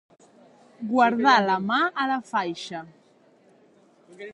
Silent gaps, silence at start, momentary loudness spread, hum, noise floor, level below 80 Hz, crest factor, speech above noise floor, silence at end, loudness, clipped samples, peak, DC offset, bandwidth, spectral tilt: none; 0.8 s; 18 LU; none; -58 dBFS; -74 dBFS; 20 dB; 36 dB; 0 s; -23 LUFS; under 0.1%; -6 dBFS; under 0.1%; 11 kHz; -4.5 dB/octave